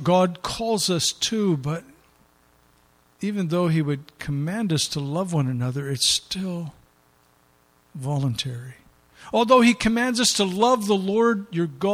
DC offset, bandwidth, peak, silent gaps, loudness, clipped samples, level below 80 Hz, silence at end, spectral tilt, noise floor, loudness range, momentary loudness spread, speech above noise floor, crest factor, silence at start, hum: under 0.1%; 16 kHz; -4 dBFS; none; -22 LUFS; under 0.1%; -54 dBFS; 0 s; -4.5 dB/octave; -60 dBFS; 7 LU; 12 LU; 38 dB; 20 dB; 0 s; 60 Hz at -50 dBFS